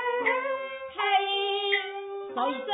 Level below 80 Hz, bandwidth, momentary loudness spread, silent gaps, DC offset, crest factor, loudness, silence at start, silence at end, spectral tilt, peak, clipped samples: -78 dBFS; 4 kHz; 10 LU; none; under 0.1%; 18 dB; -28 LUFS; 0 s; 0 s; -5.5 dB/octave; -10 dBFS; under 0.1%